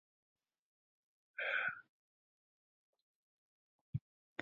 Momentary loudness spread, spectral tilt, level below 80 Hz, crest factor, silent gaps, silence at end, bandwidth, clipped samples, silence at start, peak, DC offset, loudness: 15 LU; -2.5 dB/octave; -76 dBFS; 24 dB; 1.89-2.93 s, 3.02-3.93 s, 4.01-4.36 s; 0 s; 6.6 kHz; under 0.1%; 1.4 s; -24 dBFS; under 0.1%; -42 LUFS